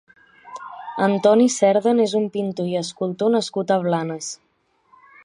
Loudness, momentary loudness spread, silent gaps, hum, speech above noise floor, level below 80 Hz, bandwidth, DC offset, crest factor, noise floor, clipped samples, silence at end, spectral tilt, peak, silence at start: -20 LUFS; 19 LU; none; none; 39 dB; -72 dBFS; 11 kHz; under 0.1%; 18 dB; -59 dBFS; under 0.1%; 0.9 s; -5 dB/octave; -4 dBFS; 0.45 s